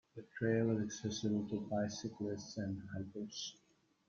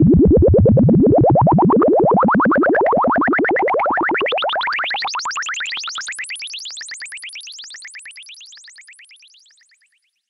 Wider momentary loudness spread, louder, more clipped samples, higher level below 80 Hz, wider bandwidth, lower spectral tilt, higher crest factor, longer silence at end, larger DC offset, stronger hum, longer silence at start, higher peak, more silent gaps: second, 10 LU vs 20 LU; second, -40 LUFS vs -15 LUFS; neither; second, -72 dBFS vs -32 dBFS; second, 7.4 kHz vs 11.5 kHz; about the same, -5.5 dB/octave vs -6 dB/octave; first, 18 dB vs 12 dB; second, 0.55 s vs 1.85 s; neither; neither; first, 0.15 s vs 0 s; second, -22 dBFS vs -4 dBFS; neither